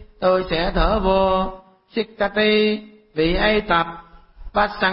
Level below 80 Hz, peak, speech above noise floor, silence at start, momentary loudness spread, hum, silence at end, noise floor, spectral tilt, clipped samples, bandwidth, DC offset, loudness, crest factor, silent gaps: -32 dBFS; -6 dBFS; 20 dB; 0 s; 12 LU; none; 0 s; -39 dBFS; -10.5 dB/octave; under 0.1%; 5.8 kHz; under 0.1%; -20 LUFS; 14 dB; none